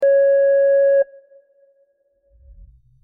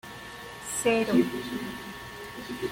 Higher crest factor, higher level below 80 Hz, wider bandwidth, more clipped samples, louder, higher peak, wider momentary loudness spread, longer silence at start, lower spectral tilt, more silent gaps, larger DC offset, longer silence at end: second, 10 dB vs 20 dB; about the same, -54 dBFS vs -58 dBFS; second, 2.9 kHz vs 17 kHz; neither; first, -16 LUFS vs -29 LUFS; about the same, -10 dBFS vs -10 dBFS; second, 5 LU vs 16 LU; about the same, 0 s vs 0.05 s; about the same, -4 dB/octave vs -4 dB/octave; neither; neither; first, 2 s vs 0 s